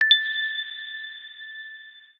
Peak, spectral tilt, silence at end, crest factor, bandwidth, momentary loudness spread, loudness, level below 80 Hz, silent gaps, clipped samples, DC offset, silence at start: -4 dBFS; 2.5 dB/octave; 0.15 s; 22 dB; 14.5 kHz; 20 LU; -24 LUFS; -88 dBFS; none; under 0.1%; under 0.1%; 0 s